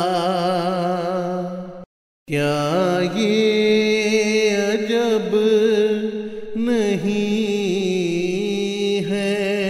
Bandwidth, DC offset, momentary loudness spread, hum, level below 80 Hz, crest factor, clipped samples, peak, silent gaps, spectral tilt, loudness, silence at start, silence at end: 13.5 kHz; under 0.1%; 8 LU; none; -58 dBFS; 14 dB; under 0.1%; -6 dBFS; 1.86-2.26 s; -5 dB/octave; -20 LUFS; 0 s; 0 s